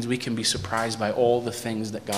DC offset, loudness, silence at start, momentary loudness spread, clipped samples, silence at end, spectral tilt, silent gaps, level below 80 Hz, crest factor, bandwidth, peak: 0.1%; -25 LUFS; 0 s; 7 LU; under 0.1%; 0 s; -4 dB/octave; none; -56 dBFS; 16 dB; 15.5 kHz; -10 dBFS